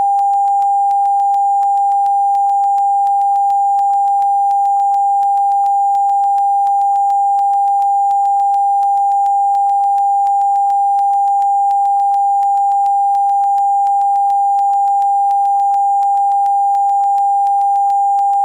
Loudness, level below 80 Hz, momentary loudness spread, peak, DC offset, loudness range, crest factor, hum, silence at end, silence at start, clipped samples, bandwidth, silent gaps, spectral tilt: -13 LUFS; -72 dBFS; 0 LU; -8 dBFS; under 0.1%; 0 LU; 4 dB; none; 0 s; 0 s; under 0.1%; 9.4 kHz; none; -0.5 dB/octave